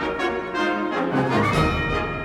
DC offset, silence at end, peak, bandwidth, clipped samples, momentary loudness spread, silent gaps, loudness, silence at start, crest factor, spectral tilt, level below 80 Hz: under 0.1%; 0 s; -6 dBFS; 15.5 kHz; under 0.1%; 4 LU; none; -22 LUFS; 0 s; 16 dB; -6 dB/octave; -36 dBFS